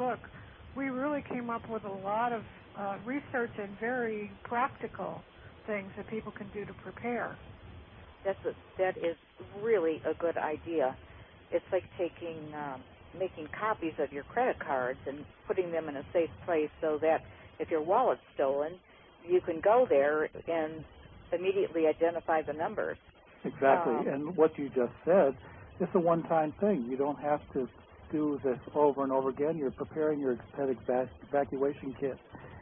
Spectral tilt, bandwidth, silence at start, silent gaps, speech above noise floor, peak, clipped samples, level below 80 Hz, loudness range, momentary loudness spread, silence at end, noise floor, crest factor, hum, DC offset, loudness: -5.5 dB/octave; 3.8 kHz; 0 s; none; 20 dB; -12 dBFS; under 0.1%; -62 dBFS; 7 LU; 14 LU; 0 s; -52 dBFS; 20 dB; none; under 0.1%; -32 LUFS